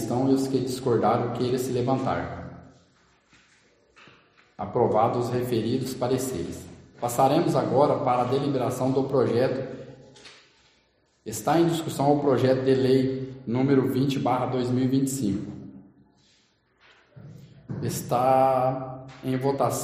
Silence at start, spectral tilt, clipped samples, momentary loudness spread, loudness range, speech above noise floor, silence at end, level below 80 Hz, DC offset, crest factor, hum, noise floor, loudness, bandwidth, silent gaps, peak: 0 s; -6.5 dB/octave; under 0.1%; 14 LU; 7 LU; 42 dB; 0 s; -58 dBFS; under 0.1%; 18 dB; none; -66 dBFS; -25 LUFS; 15 kHz; none; -8 dBFS